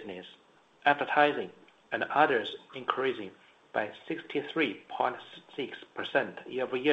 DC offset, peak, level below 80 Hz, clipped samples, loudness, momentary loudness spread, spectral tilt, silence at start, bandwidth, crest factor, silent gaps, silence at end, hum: under 0.1%; -10 dBFS; -78 dBFS; under 0.1%; -31 LUFS; 17 LU; -6 dB/octave; 0 s; 8.4 kHz; 22 dB; none; 0 s; none